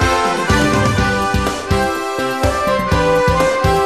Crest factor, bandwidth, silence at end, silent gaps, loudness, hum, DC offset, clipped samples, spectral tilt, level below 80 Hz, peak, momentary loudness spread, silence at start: 14 dB; 14 kHz; 0 s; none; -15 LUFS; none; 0.6%; under 0.1%; -5 dB/octave; -26 dBFS; -2 dBFS; 5 LU; 0 s